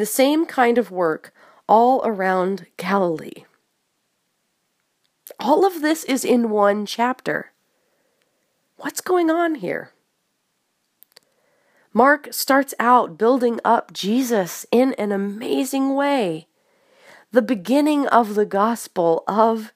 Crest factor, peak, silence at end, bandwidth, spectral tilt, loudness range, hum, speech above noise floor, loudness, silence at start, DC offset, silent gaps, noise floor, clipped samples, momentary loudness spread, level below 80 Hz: 20 dB; 0 dBFS; 0.05 s; 15.5 kHz; -4.5 dB/octave; 7 LU; none; 52 dB; -19 LUFS; 0 s; under 0.1%; none; -71 dBFS; under 0.1%; 10 LU; -74 dBFS